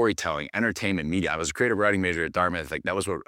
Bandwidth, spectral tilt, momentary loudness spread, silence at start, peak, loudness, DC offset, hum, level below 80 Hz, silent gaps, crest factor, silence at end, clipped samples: 16.5 kHz; -4.5 dB/octave; 5 LU; 0 s; -8 dBFS; -26 LUFS; under 0.1%; none; -50 dBFS; none; 18 dB; 0.05 s; under 0.1%